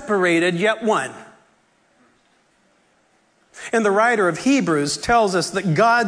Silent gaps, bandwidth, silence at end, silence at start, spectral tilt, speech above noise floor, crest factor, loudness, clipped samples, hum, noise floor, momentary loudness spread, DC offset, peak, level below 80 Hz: none; 11 kHz; 0 s; 0 s; -4.5 dB/octave; 43 dB; 14 dB; -18 LUFS; under 0.1%; none; -61 dBFS; 6 LU; under 0.1%; -6 dBFS; -52 dBFS